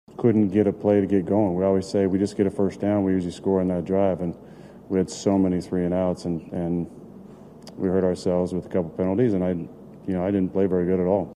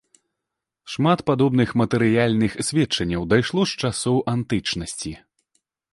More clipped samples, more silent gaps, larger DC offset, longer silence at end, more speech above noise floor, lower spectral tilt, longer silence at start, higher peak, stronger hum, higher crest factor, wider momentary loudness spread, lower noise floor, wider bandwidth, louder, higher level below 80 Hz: neither; neither; neither; second, 0 s vs 0.75 s; second, 21 dB vs 63 dB; first, -8 dB/octave vs -5.5 dB/octave; second, 0.2 s vs 0.85 s; second, -8 dBFS vs -4 dBFS; neither; about the same, 16 dB vs 18 dB; about the same, 8 LU vs 10 LU; second, -44 dBFS vs -83 dBFS; about the same, 10.5 kHz vs 11.5 kHz; about the same, -23 LUFS vs -21 LUFS; second, -56 dBFS vs -48 dBFS